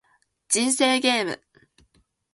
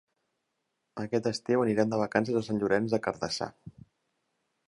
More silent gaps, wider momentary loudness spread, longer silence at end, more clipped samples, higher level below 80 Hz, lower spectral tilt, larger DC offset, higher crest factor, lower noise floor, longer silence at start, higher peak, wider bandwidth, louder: neither; about the same, 11 LU vs 9 LU; about the same, 1 s vs 0.95 s; neither; about the same, -70 dBFS vs -66 dBFS; second, -1 dB/octave vs -5.5 dB/octave; neither; about the same, 20 dB vs 24 dB; second, -64 dBFS vs -81 dBFS; second, 0.5 s vs 0.95 s; about the same, -6 dBFS vs -8 dBFS; about the same, 11.5 kHz vs 11.5 kHz; first, -21 LUFS vs -29 LUFS